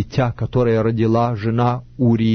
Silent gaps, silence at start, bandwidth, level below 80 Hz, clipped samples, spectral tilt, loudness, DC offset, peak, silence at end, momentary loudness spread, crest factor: none; 0 s; 6.4 kHz; -42 dBFS; under 0.1%; -9 dB/octave; -18 LUFS; under 0.1%; -6 dBFS; 0 s; 4 LU; 12 dB